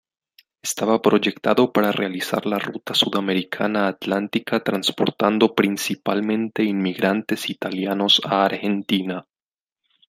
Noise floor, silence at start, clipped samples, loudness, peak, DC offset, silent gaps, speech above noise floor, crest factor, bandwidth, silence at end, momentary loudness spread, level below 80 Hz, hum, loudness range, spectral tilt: under -90 dBFS; 0.65 s; under 0.1%; -21 LUFS; -2 dBFS; under 0.1%; none; over 69 dB; 20 dB; 16 kHz; 0.85 s; 7 LU; -66 dBFS; none; 1 LU; -4.5 dB/octave